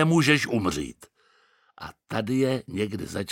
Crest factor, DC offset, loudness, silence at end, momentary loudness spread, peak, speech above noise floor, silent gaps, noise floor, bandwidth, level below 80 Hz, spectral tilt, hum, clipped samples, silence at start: 20 dB; under 0.1%; -25 LUFS; 0 s; 21 LU; -8 dBFS; 38 dB; none; -63 dBFS; 16.5 kHz; -54 dBFS; -5.5 dB/octave; none; under 0.1%; 0 s